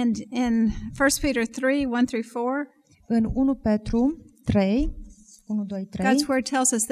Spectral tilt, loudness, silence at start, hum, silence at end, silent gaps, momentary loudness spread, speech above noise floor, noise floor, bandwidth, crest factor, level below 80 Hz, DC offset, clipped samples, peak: -4.5 dB/octave; -24 LUFS; 0 s; none; 0 s; none; 9 LU; 22 dB; -45 dBFS; 15.5 kHz; 16 dB; -40 dBFS; under 0.1%; under 0.1%; -8 dBFS